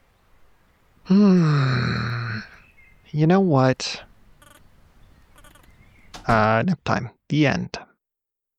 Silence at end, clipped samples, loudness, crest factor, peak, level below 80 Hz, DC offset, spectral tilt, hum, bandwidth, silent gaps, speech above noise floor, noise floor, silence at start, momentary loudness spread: 0.75 s; under 0.1%; -21 LUFS; 18 dB; -4 dBFS; -48 dBFS; under 0.1%; -7 dB/octave; none; 8.8 kHz; none; 66 dB; -85 dBFS; 1.05 s; 15 LU